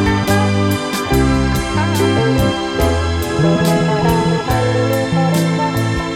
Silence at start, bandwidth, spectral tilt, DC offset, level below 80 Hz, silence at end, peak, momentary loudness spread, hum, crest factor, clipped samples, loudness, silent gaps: 0 s; 17 kHz; -6 dB/octave; under 0.1%; -28 dBFS; 0 s; -2 dBFS; 3 LU; none; 12 dB; under 0.1%; -15 LUFS; none